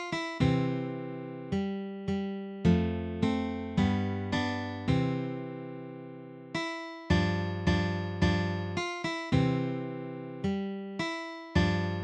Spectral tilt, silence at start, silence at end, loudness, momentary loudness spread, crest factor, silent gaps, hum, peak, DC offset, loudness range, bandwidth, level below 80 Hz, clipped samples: -7 dB/octave; 0 s; 0 s; -31 LUFS; 12 LU; 18 dB; none; none; -12 dBFS; under 0.1%; 3 LU; 9.2 kHz; -46 dBFS; under 0.1%